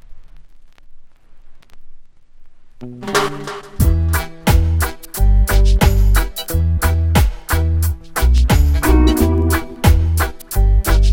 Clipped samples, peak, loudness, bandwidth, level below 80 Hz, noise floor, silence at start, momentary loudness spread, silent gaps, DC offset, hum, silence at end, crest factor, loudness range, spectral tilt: under 0.1%; 0 dBFS; -16 LUFS; 17 kHz; -18 dBFS; -37 dBFS; 0.1 s; 7 LU; none; under 0.1%; none; 0 s; 14 dB; 8 LU; -5.5 dB/octave